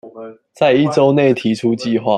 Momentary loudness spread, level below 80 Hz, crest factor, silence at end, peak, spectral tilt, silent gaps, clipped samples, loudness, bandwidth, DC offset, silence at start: 12 LU; -60 dBFS; 14 dB; 0 s; -2 dBFS; -6.5 dB/octave; none; under 0.1%; -15 LUFS; 11 kHz; under 0.1%; 0.05 s